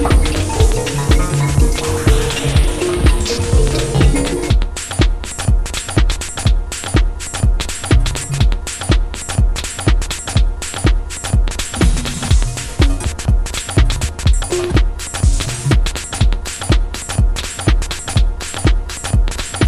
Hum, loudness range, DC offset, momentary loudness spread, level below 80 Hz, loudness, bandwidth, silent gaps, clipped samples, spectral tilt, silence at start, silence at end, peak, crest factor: none; 3 LU; under 0.1%; 5 LU; -16 dBFS; -17 LUFS; 14 kHz; none; under 0.1%; -4.5 dB/octave; 0 s; 0 s; 0 dBFS; 14 dB